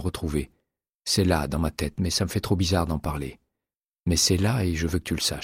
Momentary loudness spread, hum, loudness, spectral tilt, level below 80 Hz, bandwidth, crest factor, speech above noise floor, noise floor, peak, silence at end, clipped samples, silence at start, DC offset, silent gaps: 11 LU; none; -25 LUFS; -4.5 dB/octave; -38 dBFS; 16 kHz; 18 dB; over 65 dB; under -90 dBFS; -8 dBFS; 0 s; under 0.1%; 0 s; under 0.1%; 0.89-1.02 s, 3.77-3.90 s